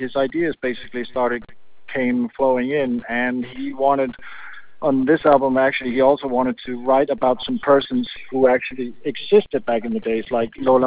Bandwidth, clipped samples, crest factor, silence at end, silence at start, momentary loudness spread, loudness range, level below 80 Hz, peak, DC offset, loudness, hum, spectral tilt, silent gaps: 4 kHz; under 0.1%; 18 dB; 0 s; 0 s; 10 LU; 4 LU; -54 dBFS; -2 dBFS; 1%; -20 LUFS; none; -9.5 dB/octave; none